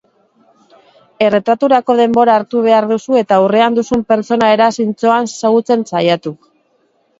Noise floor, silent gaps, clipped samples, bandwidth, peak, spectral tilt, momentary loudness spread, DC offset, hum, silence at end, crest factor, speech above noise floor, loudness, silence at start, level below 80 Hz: -58 dBFS; none; under 0.1%; 8 kHz; 0 dBFS; -5.5 dB/octave; 5 LU; under 0.1%; none; 0.85 s; 14 dB; 46 dB; -12 LUFS; 1.2 s; -54 dBFS